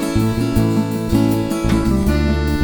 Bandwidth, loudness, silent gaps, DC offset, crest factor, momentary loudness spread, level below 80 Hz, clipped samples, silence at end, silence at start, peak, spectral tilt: over 20 kHz; -17 LUFS; none; under 0.1%; 14 dB; 2 LU; -26 dBFS; under 0.1%; 0 s; 0 s; -2 dBFS; -7 dB/octave